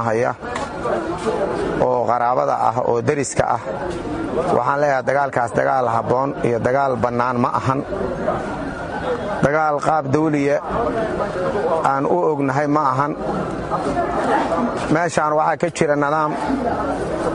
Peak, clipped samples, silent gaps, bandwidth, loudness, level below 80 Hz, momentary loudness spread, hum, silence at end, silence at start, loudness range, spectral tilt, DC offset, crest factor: -2 dBFS; under 0.1%; none; 11.5 kHz; -19 LUFS; -42 dBFS; 6 LU; none; 0 s; 0 s; 1 LU; -6 dB/octave; under 0.1%; 18 dB